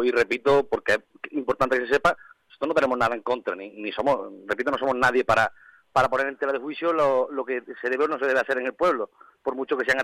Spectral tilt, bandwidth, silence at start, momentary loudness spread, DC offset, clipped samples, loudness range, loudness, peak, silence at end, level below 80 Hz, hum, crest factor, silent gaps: -5 dB/octave; 15 kHz; 0 s; 10 LU; under 0.1%; under 0.1%; 2 LU; -24 LUFS; -6 dBFS; 0 s; -56 dBFS; none; 18 dB; none